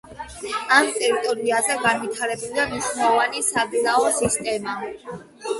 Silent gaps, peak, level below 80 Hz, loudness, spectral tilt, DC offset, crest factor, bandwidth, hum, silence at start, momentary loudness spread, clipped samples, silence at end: none; -2 dBFS; -54 dBFS; -21 LUFS; -2 dB/octave; under 0.1%; 20 dB; 12 kHz; none; 0.05 s; 15 LU; under 0.1%; 0 s